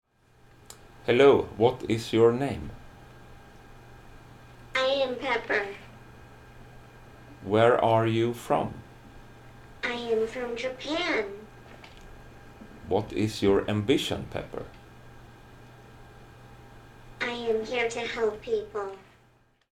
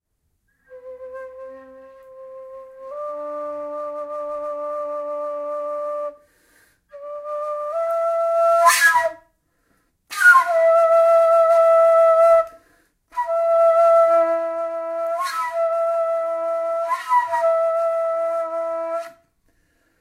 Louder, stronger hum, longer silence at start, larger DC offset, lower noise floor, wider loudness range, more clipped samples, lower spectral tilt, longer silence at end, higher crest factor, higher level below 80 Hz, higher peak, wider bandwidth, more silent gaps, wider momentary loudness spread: second, -27 LUFS vs -19 LUFS; neither; about the same, 0.7 s vs 0.7 s; neither; second, -63 dBFS vs -70 dBFS; second, 7 LU vs 16 LU; neither; first, -5.5 dB/octave vs 0 dB/octave; second, 0.7 s vs 0.9 s; about the same, 22 dB vs 18 dB; first, -54 dBFS vs -68 dBFS; second, -6 dBFS vs -2 dBFS; about the same, 15 kHz vs 16 kHz; neither; about the same, 24 LU vs 22 LU